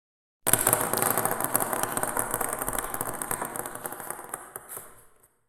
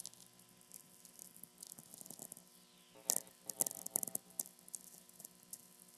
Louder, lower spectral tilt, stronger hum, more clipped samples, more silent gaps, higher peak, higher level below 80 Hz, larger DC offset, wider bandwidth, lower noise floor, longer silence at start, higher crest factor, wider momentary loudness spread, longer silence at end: first, -27 LUFS vs -43 LUFS; first, -2.5 dB/octave vs -1 dB/octave; second, none vs 60 Hz at -75 dBFS; neither; neither; first, 0 dBFS vs -8 dBFS; first, -54 dBFS vs -90 dBFS; neither; about the same, 17 kHz vs 16 kHz; second, -58 dBFS vs -65 dBFS; first, 0.45 s vs 0 s; second, 30 dB vs 40 dB; second, 16 LU vs 21 LU; first, 0.5 s vs 0 s